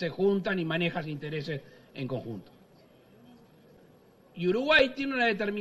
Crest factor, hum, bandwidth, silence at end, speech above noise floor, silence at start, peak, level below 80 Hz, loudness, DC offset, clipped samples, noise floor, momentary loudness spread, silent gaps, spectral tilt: 22 dB; none; 12 kHz; 0 s; 30 dB; 0 s; -8 dBFS; -62 dBFS; -28 LUFS; under 0.1%; under 0.1%; -59 dBFS; 18 LU; none; -6.5 dB/octave